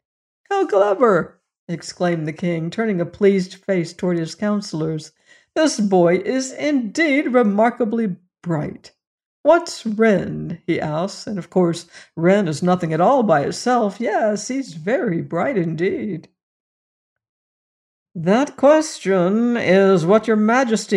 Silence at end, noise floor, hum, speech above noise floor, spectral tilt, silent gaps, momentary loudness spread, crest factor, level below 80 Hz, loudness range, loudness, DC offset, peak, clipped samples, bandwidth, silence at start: 0 s; under -90 dBFS; none; over 72 dB; -6 dB/octave; 1.59-1.67 s, 9.07-9.18 s, 9.26-9.44 s, 16.43-17.16 s, 17.29-18.06 s; 11 LU; 16 dB; -60 dBFS; 5 LU; -19 LUFS; under 0.1%; -4 dBFS; under 0.1%; 11.5 kHz; 0.5 s